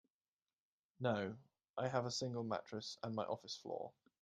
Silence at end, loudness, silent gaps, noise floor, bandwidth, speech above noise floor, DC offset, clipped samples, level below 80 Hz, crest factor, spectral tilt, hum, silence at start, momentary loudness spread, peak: 0.3 s; -44 LUFS; 1.70-1.74 s; under -90 dBFS; 11.5 kHz; over 47 dB; under 0.1%; under 0.1%; -82 dBFS; 22 dB; -5 dB/octave; none; 1 s; 9 LU; -24 dBFS